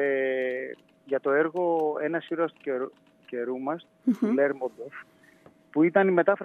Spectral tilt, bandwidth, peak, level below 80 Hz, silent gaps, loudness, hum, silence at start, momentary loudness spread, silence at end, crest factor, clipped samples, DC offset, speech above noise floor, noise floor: -8 dB/octave; 6.8 kHz; -8 dBFS; -84 dBFS; none; -27 LUFS; none; 0 s; 16 LU; 0 s; 18 dB; under 0.1%; under 0.1%; 31 dB; -57 dBFS